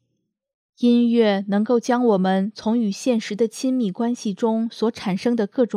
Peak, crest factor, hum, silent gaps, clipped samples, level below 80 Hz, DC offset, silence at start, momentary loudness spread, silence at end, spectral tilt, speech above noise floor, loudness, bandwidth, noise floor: -6 dBFS; 14 dB; none; none; under 0.1%; -70 dBFS; under 0.1%; 0.8 s; 6 LU; 0 s; -6 dB/octave; 55 dB; -21 LUFS; 11.5 kHz; -75 dBFS